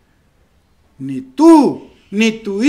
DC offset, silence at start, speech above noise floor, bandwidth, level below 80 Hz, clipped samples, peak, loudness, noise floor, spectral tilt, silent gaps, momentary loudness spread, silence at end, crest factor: under 0.1%; 1 s; 43 dB; 10.5 kHz; -56 dBFS; 0.3%; 0 dBFS; -12 LUFS; -55 dBFS; -5.5 dB/octave; none; 20 LU; 0 s; 14 dB